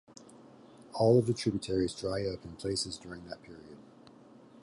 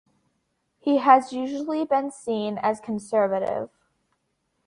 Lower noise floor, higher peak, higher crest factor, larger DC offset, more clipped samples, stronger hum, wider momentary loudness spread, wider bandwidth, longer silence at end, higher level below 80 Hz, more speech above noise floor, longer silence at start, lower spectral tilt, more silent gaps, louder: second, -56 dBFS vs -74 dBFS; second, -12 dBFS vs -4 dBFS; about the same, 20 dB vs 20 dB; neither; neither; neither; first, 25 LU vs 12 LU; about the same, 11.5 kHz vs 11.5 kHz; second, 0.8 s vs 1 s; first, -58 dBFS vs -70 dBFS; second, 24 dB vs 51 dB; second, 0.2 s vs 0.85 s; about the same, -6 dB/octave vs -5.5 dB/octave; neither; second, -31 LUFS vs -24 LUFS